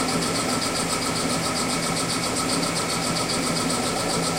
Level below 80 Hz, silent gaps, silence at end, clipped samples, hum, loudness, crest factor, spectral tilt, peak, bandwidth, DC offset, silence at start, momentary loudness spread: -48 dBFS; none; 0 s; under 0.1%; none; -23 LUFS; 14 dB; -3 dB/octave; -10 dBFS; 16 kHz; under 0.1%; 0 s; 1 LU